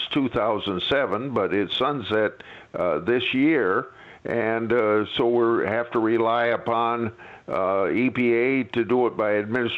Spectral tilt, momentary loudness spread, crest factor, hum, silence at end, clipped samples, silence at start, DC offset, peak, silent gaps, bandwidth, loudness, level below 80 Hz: -7.5 dB/octave; 7 LU; 14 dB; none; 0 s; under 0.1%; 0 s; under 0.1%; -10 dBFS; none; 6.2 kHz; -23 LUFS; -60 dBFS